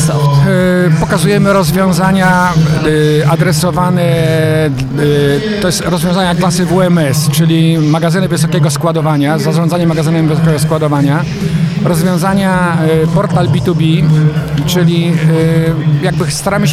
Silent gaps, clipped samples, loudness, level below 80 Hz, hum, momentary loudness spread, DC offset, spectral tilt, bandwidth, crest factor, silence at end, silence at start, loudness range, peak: none; under 0.1%; -11 LUFS; -34 dBFS; none; 3 LU; under 0.1%; -6 dB/octave; 15 kHz; 10 dB; 0 s; 0 s; 2 LU; 0 dBFS